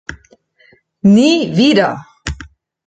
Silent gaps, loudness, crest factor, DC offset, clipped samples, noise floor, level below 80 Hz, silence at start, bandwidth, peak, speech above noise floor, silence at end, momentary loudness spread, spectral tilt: none; -12 LUFS; 14 dB; under 0.1%; under 0.1%; -52 dBFS; -38 dBFS; 0.1 s; 9 kHz; -2 dBFS; 41 dB; 0.4 s; 18 LU; -5.5 dB/octave